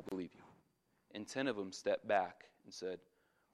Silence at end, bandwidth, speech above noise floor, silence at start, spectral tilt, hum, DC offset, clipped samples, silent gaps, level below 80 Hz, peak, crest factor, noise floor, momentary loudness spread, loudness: 0.55 s; 13.5 kHz; 38 dB; 0 s; -4 dB/octave; none; under 0.1%; under 0.1%; none; -84 dBFS; -20 dBFS; 22 dB; -78 dBFS; 17 LU; -41 LUFS